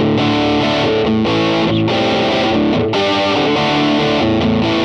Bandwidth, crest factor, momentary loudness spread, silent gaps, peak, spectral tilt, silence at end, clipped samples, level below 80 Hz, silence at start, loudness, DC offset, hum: 9.2 kHz; 10 dB; 1 LU; none; -4 dBFS; -6 dB/octave; 0 s; under 0.1%; -38 dBFS; 0 s; -14 LUFS; under 0.1%; none